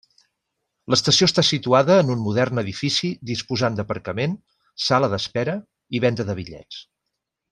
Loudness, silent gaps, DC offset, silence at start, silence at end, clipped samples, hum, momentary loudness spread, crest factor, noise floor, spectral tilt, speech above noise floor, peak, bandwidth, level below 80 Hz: -21 LUFS; none; under 0.1%; 0.9 s; 0.7 s; under 0.1%; none; 16 LU; 20 dB; -80 dBFS; -4.5 dB/octave; 59 dB; -2 dBFS; 11.5 kHz; -58 dBFS